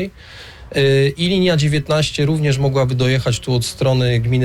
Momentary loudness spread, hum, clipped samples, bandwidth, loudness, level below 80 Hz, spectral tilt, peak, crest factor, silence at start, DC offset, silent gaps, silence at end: 9 LU; none; under 0.1%; 12.5 kHz; -16 LUFS; -40 dBFS; -6 dB/octave; -6 dBFS; 10 dB; 0 s; under 0.1%; none; 0 s